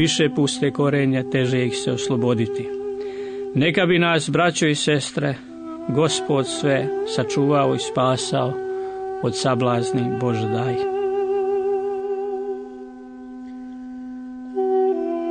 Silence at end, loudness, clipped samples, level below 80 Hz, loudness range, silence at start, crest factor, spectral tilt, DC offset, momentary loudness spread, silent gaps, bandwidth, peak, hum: 0 s; -21 LUFS; under 0.1%; -60 dBFS; 6 LU; 0 s; 16 dB; -5 dB/octave; under 0.1%; 16 LU; none; 9.6 kHz; -6 dBFS; none